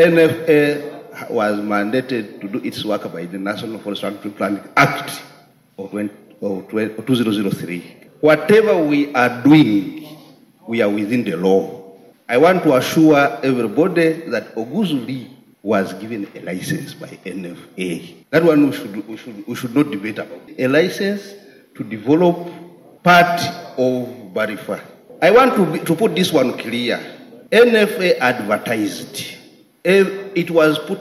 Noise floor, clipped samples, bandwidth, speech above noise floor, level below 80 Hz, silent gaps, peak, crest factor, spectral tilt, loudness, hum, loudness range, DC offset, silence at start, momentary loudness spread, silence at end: -46 dBFS; under 0.1%; 15 kHz; 29 dB; -62 dBFS; none; 0 dBFS; 16 dB; -6 dB/octave; -17 LUFS; none; 7 LU; under 0.1%; 0 s; 17 LU; 0 s